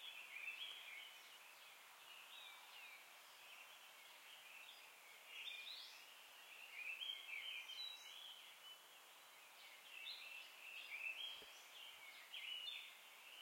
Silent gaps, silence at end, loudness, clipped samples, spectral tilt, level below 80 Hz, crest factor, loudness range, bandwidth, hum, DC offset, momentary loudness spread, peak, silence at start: none; 0 s; -54 LUFS; under 0.1%; 2.5 dB/octave; under -90 dBFS; 18 dB; 7 LU; 16.5 kHz; none; under 0.1%; 12 LU; -38 dBFS; 0 s